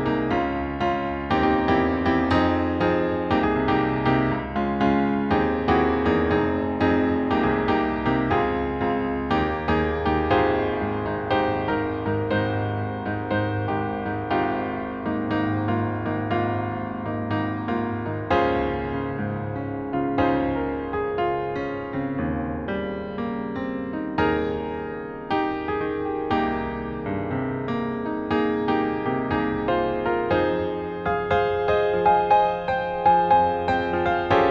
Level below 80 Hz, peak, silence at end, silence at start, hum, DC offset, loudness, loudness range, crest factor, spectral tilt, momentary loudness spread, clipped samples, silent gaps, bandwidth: -42 dBFS; -6 dBFS; 0 s; 0 s; none; under 0.1%; -24 LUFS; 5 LU; 16 dB; -8.5 dB/octave; 8 LU; under 0.1%; none; 7 kHz